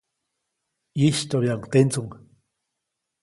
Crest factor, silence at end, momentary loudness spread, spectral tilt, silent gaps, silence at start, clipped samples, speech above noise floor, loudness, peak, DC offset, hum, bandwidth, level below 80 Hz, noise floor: 20 dB; 1.1 s; 12 LU; -6 dB/octave; none; 0.95 s; under 0.1%; 60 dB; -22 LUFS; -4 dBFS; under 0.1%; none; 11.5 kHz; -60 dBFS; -82 dBFS